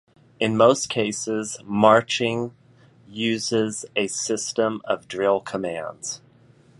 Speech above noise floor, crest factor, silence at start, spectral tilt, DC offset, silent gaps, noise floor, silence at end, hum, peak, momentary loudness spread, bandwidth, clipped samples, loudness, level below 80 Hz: 32 dB; 22 dB; 0.4 s; -4 dB/octave; under 0.1%; none; -54 dBFS; 0.6 s; none; -2 dBFS; 13 LU; 11.5 kHz; under 0.1%; -23 LUFS; -64 dBFS